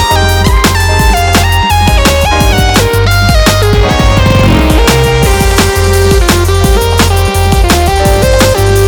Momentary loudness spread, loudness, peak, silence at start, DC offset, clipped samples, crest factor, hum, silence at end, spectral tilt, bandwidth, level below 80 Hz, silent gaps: 1 LU; -8 LUFS; 0 dBFS; 0 s; under 0.1%; 0.9%; 6 dB; none; 0 s; -4.5 dB/octave; over 20 kHz; -12 dBFS; none